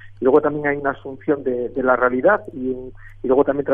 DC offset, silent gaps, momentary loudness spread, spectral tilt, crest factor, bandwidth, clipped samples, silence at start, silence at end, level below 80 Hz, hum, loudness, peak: under 0.1%; none; 12 LU; -10 dB/octave; 16 dB; 3.6 kHz; under 0.1%; 0.05 s; 0 s; -46 dBFS; none; -19 LUFS; -2 dBFS